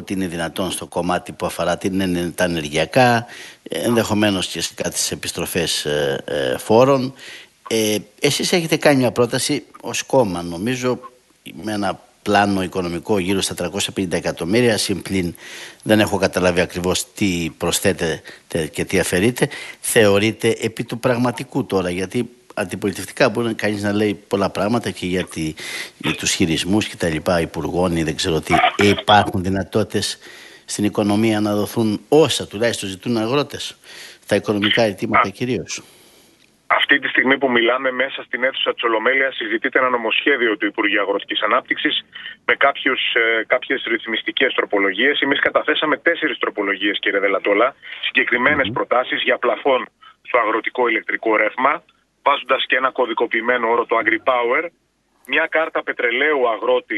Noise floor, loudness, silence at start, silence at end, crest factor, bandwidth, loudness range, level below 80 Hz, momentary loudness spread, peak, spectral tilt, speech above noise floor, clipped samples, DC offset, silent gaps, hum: -54 dBFS; -19 LUFS; 0 s; 0 s; 18 dB; 12.5 kHz; 3 LU; -50 dBFS; 9 LU; 0 dBFS; -4 dB/octave; 35 dB; under 0.1%; under 0.1%; none; none